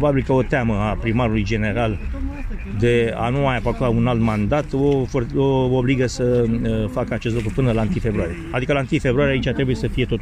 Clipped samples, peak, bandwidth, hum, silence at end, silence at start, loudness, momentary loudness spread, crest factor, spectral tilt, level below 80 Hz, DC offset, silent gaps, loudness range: under 0.1%; -6 dBFS; 10 kHz; none; 0 s; 0 s; -20 LUFS; 5 LU; 14 dB; -7.5 dB/octave; -30 dBFS; under 0.1%; none; 2 LU